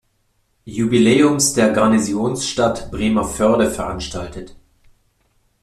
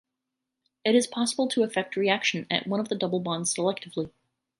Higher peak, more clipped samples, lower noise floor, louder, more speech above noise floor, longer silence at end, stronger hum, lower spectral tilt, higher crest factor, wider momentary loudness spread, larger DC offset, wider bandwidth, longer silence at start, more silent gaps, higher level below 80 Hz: first, 0 dBFS vs -8 dBFS; neither; second, -64 dBFS vs -85 dBFS; first, -17 LUFS vs -27 LUFS; second, 47 dB vs 58 dB; first, 1.1 s vs 0.5 s; neither; about the same, -4.5 dB/octave vs -3.5 dB/octave; about the same, 18 dB vs 20 dB; first, 14 LU vs 8 LU; neither; first, 14 kHz vs 11.5 kHz; second, 0.65 s vs 0.85 s; neither; first, -42 dBFS vs -72 dBFS